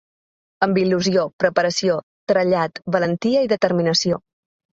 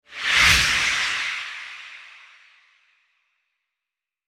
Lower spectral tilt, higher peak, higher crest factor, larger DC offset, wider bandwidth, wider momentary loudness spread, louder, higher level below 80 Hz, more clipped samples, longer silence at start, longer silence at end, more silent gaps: first, -5 dB/octave vs 0 dB/octave; about the same, -2 dBFS vs -2 dBFS; about the same, 18 dB vs 22 dB; neither; second, 8 kHz vs 19 kHz; second, 5 LU vs 22 LU; about the same, -19 LUFS vs -18 LUFS; second, -60 dBFS vs -44 dBFS; neither; first, 0.6 s vs 0.1 s; second, 0.6 s vs 2.2 s; first, 1.33-1.39 s, 2.03-2.27 s vs none